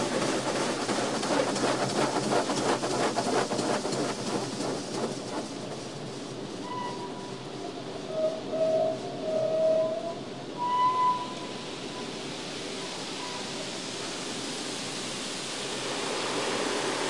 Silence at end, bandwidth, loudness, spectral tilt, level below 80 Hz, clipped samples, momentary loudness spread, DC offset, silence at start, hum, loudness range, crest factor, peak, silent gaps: 0 s; 11.5 kHz; -30 LUFS; -3.5 dB/octave; -66 dBFS; under 0.1%; 11 LU; 0.2%; 0 s; none; 7 LU; 18 dB; -12 dBFS; none